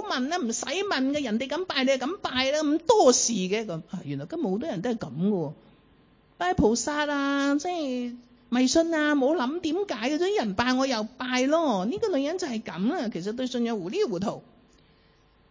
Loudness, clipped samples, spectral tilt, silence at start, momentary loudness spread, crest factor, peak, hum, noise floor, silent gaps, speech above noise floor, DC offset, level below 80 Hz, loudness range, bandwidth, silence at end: -26 LUFS; under 0.1%; -4 dB/octave; 0 s; 9 LU; 20 dB; -6 dBFS; none; -61 dBFS; none; 35 dB; under 0.1%; -54 dBFS; 5 LU; 7.6 kHz; 1.1 s